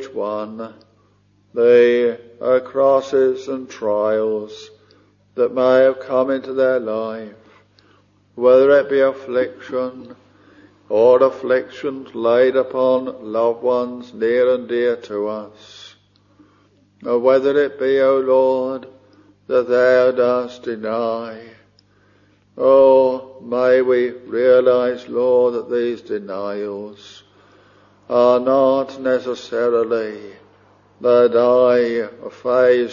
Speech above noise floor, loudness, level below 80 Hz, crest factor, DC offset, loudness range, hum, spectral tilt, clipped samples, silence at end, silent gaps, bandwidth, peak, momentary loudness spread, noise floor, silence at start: 40 dB; -17 LUFS; -66 dBFS; 16 dB; under 0.1%; 4 LU; 50 Hz at -55 dBFS; -6 dB/octave; under 0.1%; 0 s; none; 7.2 kHz; -2 dBFS; 14 LU; -57 dBFS; 0 s